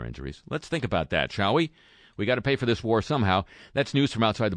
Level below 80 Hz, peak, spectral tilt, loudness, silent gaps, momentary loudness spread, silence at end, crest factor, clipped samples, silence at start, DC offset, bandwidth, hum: -48 dBFS; -8 dBFS; -6 dB/octave; -26 LUFS; none; 10 LU; 0 s; 18 dB; under 0.1%; 0 s; under 0.1%; 10 kHz; none